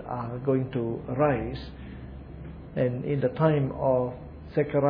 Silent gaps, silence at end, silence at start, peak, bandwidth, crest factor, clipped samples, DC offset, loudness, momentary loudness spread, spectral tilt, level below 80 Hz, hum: none; 0 s; 0 s; -8 dBFS; 5 kHz; 20 dB; under 0.1%; under 0.1%; -27 LUFS; 18 LU; -11 dB/octave; -46 dBFS; none